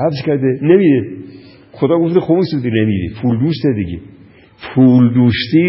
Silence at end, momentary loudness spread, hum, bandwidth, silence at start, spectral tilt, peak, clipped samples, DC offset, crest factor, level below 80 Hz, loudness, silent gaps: 0 s; 12 LU; none; 5.8 kHz; 0 s; -12 dB/octave; 0 dBFS; under 0.1%; under 0.1%; 14 dB; -40 dBFS; -13 LUFS; none